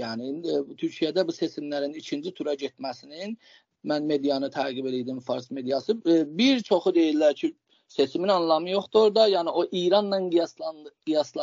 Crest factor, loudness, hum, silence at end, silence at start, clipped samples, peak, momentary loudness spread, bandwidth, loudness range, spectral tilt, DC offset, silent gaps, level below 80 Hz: 18 dB; -25 LUFS; none; 0 s; 0 s; under 0.1%; -8 dBFS; 14 LU; 7.4 kHz; 7 LU; -3.5 dB/octave; under 0.1%; none; -76 dBFS